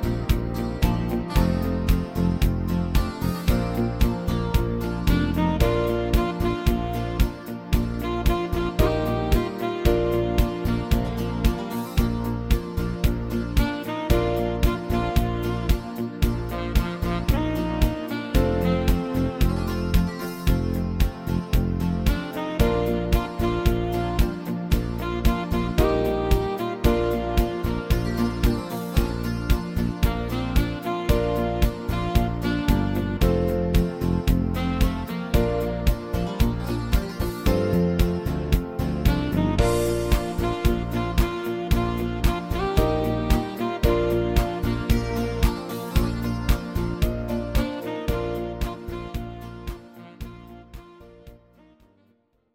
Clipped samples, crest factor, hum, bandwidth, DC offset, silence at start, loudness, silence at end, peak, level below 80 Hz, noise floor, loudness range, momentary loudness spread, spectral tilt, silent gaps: under 0.1%; 20 dB; none; 17 kHz; under 0.1%; 0 s; -25 LUFS; 1.2 s; -4 dBFS; -28 dBFS; -65 dBFS; 2 LU; 6 LU; -7 dB/octave; none